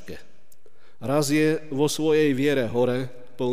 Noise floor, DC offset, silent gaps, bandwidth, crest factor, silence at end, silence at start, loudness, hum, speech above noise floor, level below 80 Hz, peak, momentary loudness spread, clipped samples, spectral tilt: -59 dBFS; 2%; none; 15.5 kHz; 14 dB; 0 s; 0.1 s; -23 LUFS; none; 37 dB; -62 dBFS; -10 dBFS; 16 LU; under 0.1%; -5.5 dB/octave